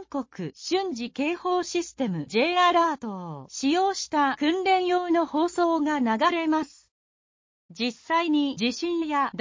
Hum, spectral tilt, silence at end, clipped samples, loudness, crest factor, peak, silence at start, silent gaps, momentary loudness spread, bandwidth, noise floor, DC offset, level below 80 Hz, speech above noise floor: none; -4 dB/octave; 0 s; under 0.1%; -25 LUFS; 16 dB; -10 dBFS; 0 s; 6.91-7.69 s; 10 LU; 7.6 kHz; under -90 dBFS; under 0.1%; -66 dBFS; over 65 dB